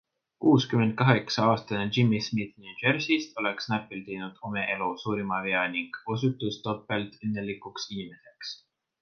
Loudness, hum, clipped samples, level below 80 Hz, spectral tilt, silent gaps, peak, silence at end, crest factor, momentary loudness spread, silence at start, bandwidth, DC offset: -28 LUFS; none; under 0.1%; -64 dBFS; -6 dB/octave; none; -4 dBFS; 0.45 s; 24 dB; 14 LU; 0.4 s; 6.8 kHz; under 0.1%